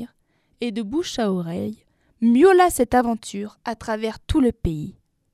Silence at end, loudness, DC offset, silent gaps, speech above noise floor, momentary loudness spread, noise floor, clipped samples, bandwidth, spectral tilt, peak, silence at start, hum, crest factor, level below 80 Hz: 0.4 s; -21 LUFS; under 0.1%; none; 45 dB; 17 LU; -65 dBFS; under 0.1%; 15 kHz; -5.5 dB/octave; -4 dBFS; 0 s; none; 18 dB; -40 dBFS